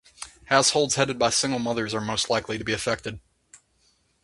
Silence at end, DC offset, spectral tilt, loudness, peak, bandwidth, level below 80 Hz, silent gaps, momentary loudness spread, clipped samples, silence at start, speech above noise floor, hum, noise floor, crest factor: 1.05 s; under 0.1%; -2.5 dB/octave; -24 LUFS; -2 dBFS; 11.5 kHz; -54 dBFS; none; 17 LU; under 0.1%; 0.2 s; 42 dB; none; -66 dBFS; 24 dB